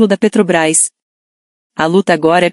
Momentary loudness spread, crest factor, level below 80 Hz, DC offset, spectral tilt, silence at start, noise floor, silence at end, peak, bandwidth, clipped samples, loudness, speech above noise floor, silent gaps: 7 LU; 12 dB; -56 dBFS; under 0.1%; -4 dB/octave; 0 s; under -90 dBFS; 0 s; 0 dBFS; 12 kHz; under 0.1%; -12 LUFS; over 79 dB; 1.02-1.70 s